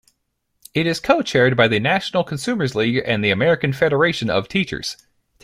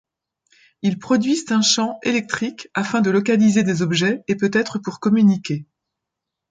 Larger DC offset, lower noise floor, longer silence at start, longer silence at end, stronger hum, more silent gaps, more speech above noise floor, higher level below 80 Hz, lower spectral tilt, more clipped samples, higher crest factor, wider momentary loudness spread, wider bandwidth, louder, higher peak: neither; second, -72 dBFS vs -83 dBFS; about the same, 0.75 s vs 0.85 s; second, 0.5 s vs 0.85 s; neither; neither; second, 54 dB vs 64 dB; first, -52 dBFS vs -62 dBFS; about the same, -5.5 dB/octave vs -4.5 dB/octave; neither; about the same, 18 dB vs 16 dB; about the same, 8 LU vs 9 LU; first, 15.5 kHz vs 9.4 kHz; about the same, -19 LUFS vs -19 LUFS; about the same, -2 dBFS vs -4 dBFS